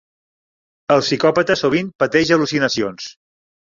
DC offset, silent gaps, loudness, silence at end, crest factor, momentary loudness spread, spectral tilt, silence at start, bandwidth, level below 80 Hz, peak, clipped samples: under 0.1%; 1.95-1.99 s; -17 LUFS; 0.65 s; 18 dB; 14 LU; -4.5 dB/octave; 0.9 s; 7.6 kHz; -54 dBFS; -2 dBFS; under 0.1%